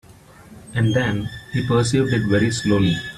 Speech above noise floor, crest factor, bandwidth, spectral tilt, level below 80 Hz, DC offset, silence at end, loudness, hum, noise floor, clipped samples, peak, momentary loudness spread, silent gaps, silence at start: 26 dB; 14 dB; 13 kHz; -6 dB/octave; -46 dBFS; under 0.1%; 0 s; -20 LUFS; none; -45 dBFS; under 0.1%; -6 dBFS; 8 LU; none; 0.4 s